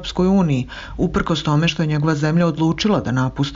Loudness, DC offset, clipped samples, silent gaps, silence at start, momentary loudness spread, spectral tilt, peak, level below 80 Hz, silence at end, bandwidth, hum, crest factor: -18 LUFS; under 0.1%; under 0.1%; none; 0 s; 5 LU; -6.5 dB/octave; -8 dBFS; -38 dBFS; 0 s; 7.6 kHz; none; 10 dB